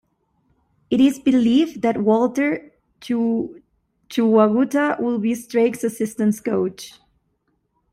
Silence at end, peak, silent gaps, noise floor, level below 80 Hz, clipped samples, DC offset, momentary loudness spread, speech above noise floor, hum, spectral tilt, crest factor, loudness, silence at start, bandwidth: 1 s; -4 dBFS; none; -69 dBFS; -60 dBFS; under 0.1%; under 0.1%; 10 LU; 50 dB; none; -6 dB/octave; 16 dB; -20 LUFS; 0.9 s; 15.5 kHz